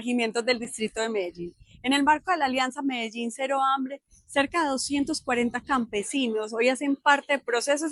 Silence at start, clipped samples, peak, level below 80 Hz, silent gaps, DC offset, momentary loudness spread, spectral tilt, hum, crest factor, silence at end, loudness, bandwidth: 0 s; under 0.1%; -8 dBFS; -60 dBFS; none; under 0.1%; 9 LU; -2.5 dB/octave; none; 18 dB; 0 s; -26 LUFS; 12 kHz